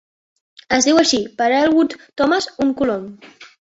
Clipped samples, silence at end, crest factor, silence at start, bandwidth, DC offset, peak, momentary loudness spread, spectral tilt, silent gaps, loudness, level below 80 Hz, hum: under 0.1%; 0.35 s; 16 dB; 0.7 s; 8 kHz; under 0.1%; -2 dBFS; 8 LU; -2.5 dB/octave; none; -17 LUFS; -54 dBFS; none